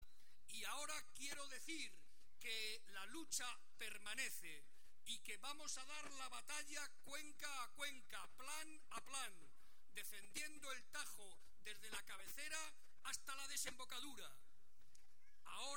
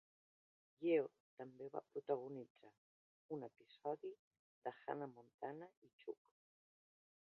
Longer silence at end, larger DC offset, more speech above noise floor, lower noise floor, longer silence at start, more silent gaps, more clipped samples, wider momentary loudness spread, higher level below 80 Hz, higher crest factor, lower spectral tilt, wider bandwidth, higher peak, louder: second, 0 s vs 1.15 s; first, 0.4% vs under 0.1%; second, 25 dB vs over 43 dB; second, -78 dBFS vs under -90 dBFS; second, 0 s vs 0.8 s; second, none vs 1.20-1.37 s, 2.50-2.55 s, 2.78-3.29 s, 4.19-4.31 s, 4.39-4.62 s, 5.34-5.39 s, 5.77-5.82 s, 5.93-5.99 s; neither; second, 10 LU vs 18 LU; first, -80 dBFS vs under -90 dBFS; about the same, 22 dB vs 22 dB; second, 0 dB/octave vs -5.5 dB/octave; first, 17 kHz vs 5 kHz; about the same, -30 dBFS vs -28 dBFS; second, -51 LUFS vs -48 LUFS